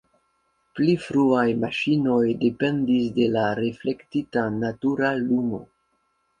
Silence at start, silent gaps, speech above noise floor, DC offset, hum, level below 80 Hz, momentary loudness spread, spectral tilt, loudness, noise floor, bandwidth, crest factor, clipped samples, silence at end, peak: 0.75 s; none; 48 dB; under 0.1%; none; -58 dBFS; 7 LU; -7.5 dB/octave; -23 LUFS; -70 dBFS; 9.6 kHz; 18 dB; under 0.1%; 0.75 s; -6 dBFS